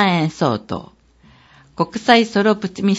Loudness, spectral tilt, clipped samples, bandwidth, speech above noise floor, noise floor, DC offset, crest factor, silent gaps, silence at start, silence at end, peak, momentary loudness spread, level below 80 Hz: -17 LUFS; -5.5 dB/octave; under 0.1%; 8 kHz; 33 dB; -50 dBFS; under 0.1%; 18 dB; none; 0 s; 0 s; 0 dBFS; 12 LU; -56 dBFS